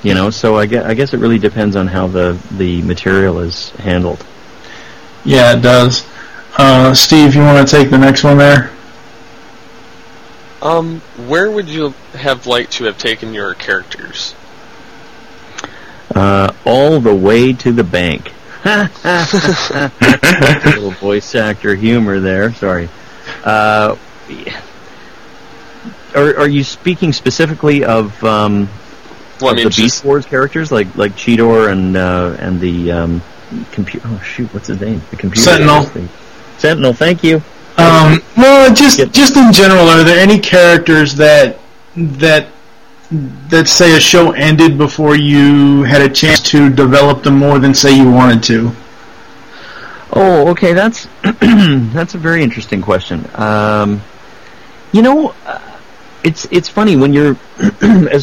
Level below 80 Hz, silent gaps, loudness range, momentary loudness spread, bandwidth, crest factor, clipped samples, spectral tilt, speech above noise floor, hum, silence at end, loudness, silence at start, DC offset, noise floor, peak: -38 dBFS; none; 10 LU; 15 LU; 17 kHz; 10 dB; under 0.1%; -5 dB/octave; 33 dB; none; 0 s; -9 LUFS; 0.05 s; 2%; -41 dBFS; 0 dBFS